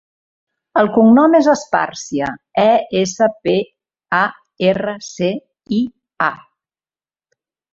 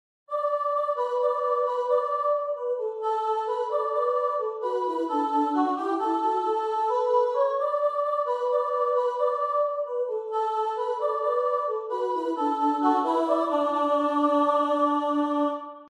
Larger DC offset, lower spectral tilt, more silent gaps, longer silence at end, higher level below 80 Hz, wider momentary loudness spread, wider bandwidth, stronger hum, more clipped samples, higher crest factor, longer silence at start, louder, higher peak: neither; first, -5.5 dB/octave vs -4 dB/octave; neither; first, 1.35 s vs 0 s; first, -56 dBFS vs -82 dBFS; first, 11 LU vs 5 LU; second, 7.8 kHz vs 10.5 kHz; neither; neither; about the same, 16 dB vs 14 dB; first, 0.75 s vs 0.3 s; first, -16 LUFS vs -26 LUFS; first, -2 dBFS vs -10 dBFS